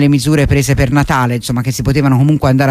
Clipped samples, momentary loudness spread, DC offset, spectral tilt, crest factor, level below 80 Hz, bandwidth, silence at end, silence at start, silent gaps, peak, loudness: under 0.1%; 5 LU; under 0.1%; -6.5 dB/octave; 10 dB; -26 dBFS; 15.5 kHz; 0 s; 0 s; none; 0 dBFS; -12 LUFS